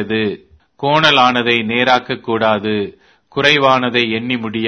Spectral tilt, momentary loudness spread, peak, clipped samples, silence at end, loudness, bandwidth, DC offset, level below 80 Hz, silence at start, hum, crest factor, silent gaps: -5 dB/octave; 12 LU; 0 dBFS; under 0.1%; 0 s; -14 LUFS; 11 kHz; under 0.1%; -54 dBFS; 0 s; none; 16 dB; none